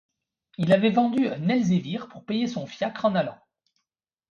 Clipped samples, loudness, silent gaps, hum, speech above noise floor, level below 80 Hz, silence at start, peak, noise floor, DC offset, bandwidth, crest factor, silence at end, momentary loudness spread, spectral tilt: under 0.1%; -25 LUFS; none; none; 60 dB; -68 dBFS; 0.6 s; -8 dBFS; -84 dBFS; under 0.1%; 7.6 kHz; 18 dB; 0.95 s; 13 LU; -7 dB/octave